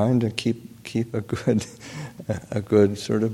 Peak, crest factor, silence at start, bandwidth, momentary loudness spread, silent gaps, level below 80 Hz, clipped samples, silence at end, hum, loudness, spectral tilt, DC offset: -6 dBFS; 18 dB; 0 s; 15.5 kHz; 15 LU; none; -56 dBFS; under 0.1%; 0 s; none; -24 LUFS; -6.5 dB/octave; under 0.1%